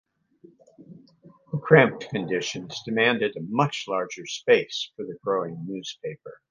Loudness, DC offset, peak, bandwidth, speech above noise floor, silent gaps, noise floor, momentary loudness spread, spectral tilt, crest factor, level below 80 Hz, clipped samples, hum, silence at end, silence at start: -25 LUFS; under 0.1%; 0 dBFS; 7.4 kHz; 31 dB; none; -56 dBFS; 16 LU; -5 dB/octave; 26 dB; -68 dBFS; under 0.1%; none; 0.15 s; 0.8 s